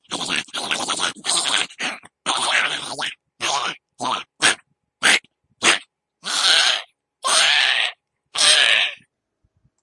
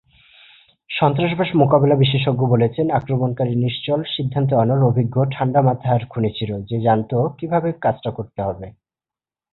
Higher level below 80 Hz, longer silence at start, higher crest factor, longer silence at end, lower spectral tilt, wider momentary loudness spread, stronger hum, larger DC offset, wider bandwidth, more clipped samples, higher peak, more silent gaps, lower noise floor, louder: second, -70 dBFS vs -50 dBFS; second, 0.1 s vs 0.9 s; about the same, 20 dB vs 16 dB; about the same, 0.85 s vs 0.85 s; second, 1 dB/octave vs -11.5 dB/octave; about the same, 13 LU vs 11 LU; neither; neither; first, 11.5 kHz vs 4.2 kHz; neither; about the same, -2 dBFS vs -2 dBFS; neither; second, -70 dBFS vs under -90 dBFS; about the same, -18 LUFS vs -19 LUFS